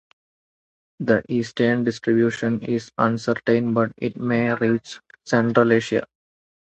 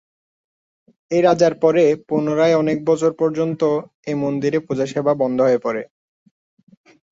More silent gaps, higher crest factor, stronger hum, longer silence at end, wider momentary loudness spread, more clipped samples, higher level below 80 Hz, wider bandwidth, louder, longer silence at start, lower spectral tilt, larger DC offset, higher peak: second, none vs 3.94-4.03 s; about the same, 20 dB vs 16 dB; neither; second, 0.6 s vs 1.25 s; about the same, 8 LU vs 8 LU; neither; about the same, -60 dBFS vs -62 dBFS; about the same, 8.2 kHz vs 7.8 kHz; second, -21 LUFS vs -18 LUFS; about the same, 1 s vs 1.1 s; about the same, -6.5 dB/octave vs -6.5 dB/octave; neither; about the same, -2 dBFS vs -2 dBFS